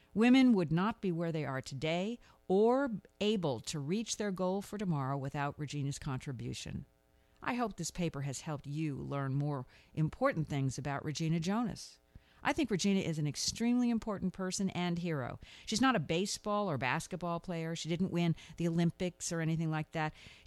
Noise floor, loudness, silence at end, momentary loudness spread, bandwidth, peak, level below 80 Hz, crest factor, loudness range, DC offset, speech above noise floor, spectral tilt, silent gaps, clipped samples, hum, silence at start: -68 dBFS; -35 LUFS; 0.1 s; 10 LU; 13 kHz; -16 dBFS; -60 dBFS; 18 dB; 5 LU; under 0.1%; 34 dB; -5.5 dB/octave; none; under 0.1%; none; 0.15 s